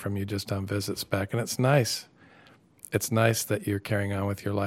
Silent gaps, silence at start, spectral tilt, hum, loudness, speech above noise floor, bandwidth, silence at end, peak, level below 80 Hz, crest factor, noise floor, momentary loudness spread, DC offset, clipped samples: none; 0 s; -5 dB/octave; none; -28 LUFS; 29 dB; 16.5 kHz; 0 s; -6 dBFS; -64 dBFS; 22 dB; -57 dBFS; 8 LU; under 0.1%; under 0.1%